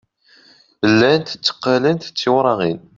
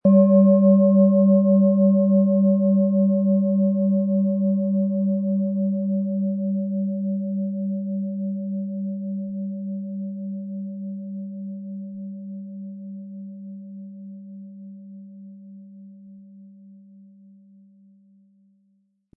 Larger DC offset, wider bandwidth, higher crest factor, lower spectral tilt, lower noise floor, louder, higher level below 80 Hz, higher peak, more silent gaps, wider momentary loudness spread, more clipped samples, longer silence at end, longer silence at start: neither; first, 7.6 kHz vs 1.1 kHz; about the same, 16 dB vs 16 dB; second, -5.5 dB/octave vs -17 dB/octave; second, -51 dBFS vs -66 dBFS; first, -17 LUFS vs -21 LUFS; first, -58 dBFS vs -78 dBFS; first, -2 dBFS vs -6 dBFS; neither; second, 7 LU vs 23 LU; neither; second, 0.2 s vs 2.7 s; first, 0.8 s vs 0.05 s